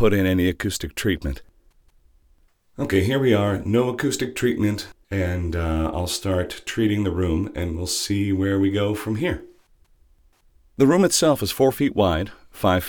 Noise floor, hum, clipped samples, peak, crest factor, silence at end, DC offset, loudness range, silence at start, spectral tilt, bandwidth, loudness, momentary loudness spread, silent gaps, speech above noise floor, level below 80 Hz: -59 dBFS; none; under 0.1%; -4 dBFS; 18 dB; 0 s; under 0.1%; 3 LU; 0 s; -5 dB/octave; 19.5 kHz; -22 LUFS; 9 LU; none; 38 dB; -40 dBFS